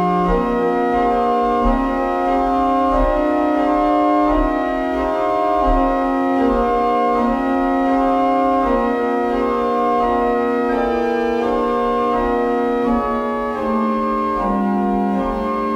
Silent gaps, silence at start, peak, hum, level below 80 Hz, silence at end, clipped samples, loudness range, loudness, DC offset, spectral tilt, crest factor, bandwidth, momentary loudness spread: none; 0 s; -4 dBFS; none; -32 dBFS; 0 s; under 0.1%; 2 LU; -17 LUFS; under 0.1%; -7.5 dB/octave; 12 dB; 10.5 kHz; 3 LU